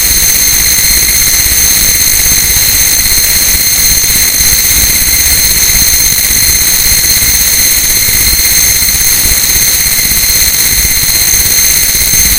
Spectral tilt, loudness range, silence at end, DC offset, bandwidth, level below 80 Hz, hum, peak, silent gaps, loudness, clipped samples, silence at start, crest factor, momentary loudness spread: 0 dB/octave; 1 LU; 0 s; under 0.1%; over 20 kHz; -22 dBFS; none; 0 dBFS; none; -4 LUFS; 3%; 0 s; 8 dB; 1 LU